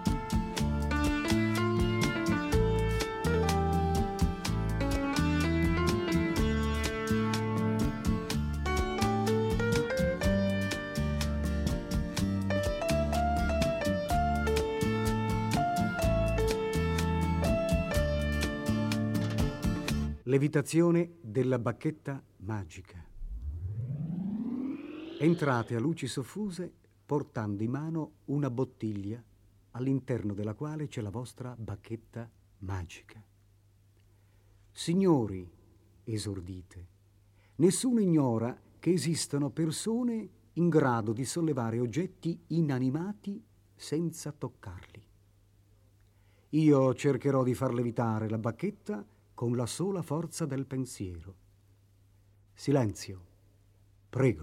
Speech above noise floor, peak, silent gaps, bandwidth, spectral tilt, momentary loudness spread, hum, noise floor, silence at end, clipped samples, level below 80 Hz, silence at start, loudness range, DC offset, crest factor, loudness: 32 dB; -12 dBFS; none; 16 kHz; -6 dB/octave; 13 LU; none; -63 dBFS; 0 s; under 0.1%; -42 dBFS; 0 s; 7 LU; under 0.1%; 18 dB; -31 LUFS